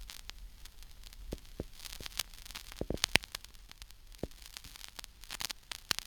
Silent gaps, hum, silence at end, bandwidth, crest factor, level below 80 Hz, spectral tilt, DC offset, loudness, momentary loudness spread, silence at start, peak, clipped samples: none; none; 0 s; over 20 kHz; 40 dB; -52 dBFS; -2 dB/octave; under 0.1%; -39 LUFS; 22 LU; 0 s; -2 dBFS; under 0.1%